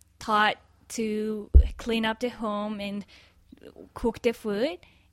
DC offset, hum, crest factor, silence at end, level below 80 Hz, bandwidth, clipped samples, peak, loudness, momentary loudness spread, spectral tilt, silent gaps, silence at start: under 0.1%; none; 24 dB; 0.35 s; -30 dBFS; 13 kHz; under 0.1%; -4 dBFS; -27 LUFS; 15 LU; -6 dB/octave; none; 0.2 s